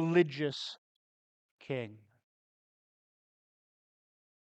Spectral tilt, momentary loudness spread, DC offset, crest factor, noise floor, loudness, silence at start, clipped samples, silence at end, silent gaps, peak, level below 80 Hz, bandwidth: -6.5 dB/octave; 17 LU; under 0.1%; 24 dB; under -90 dBFS; -34 LUFS; 0 s; under 0.1%; 2.45 s; 0.78-1.58 s; -14 dBFS; -86 dBFS; 8.4 kHz